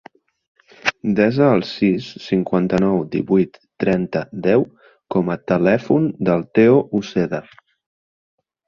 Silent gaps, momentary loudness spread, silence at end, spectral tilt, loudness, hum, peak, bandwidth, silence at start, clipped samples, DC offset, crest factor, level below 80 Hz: none; 9 LU; 1.25 s; -7.5 dB/octave; -18 LUFS; none; -2 dBFS; 7.2 kHz; 0.85 s; under 0.1%; under 0.1%; 18 dB; -52 dBFS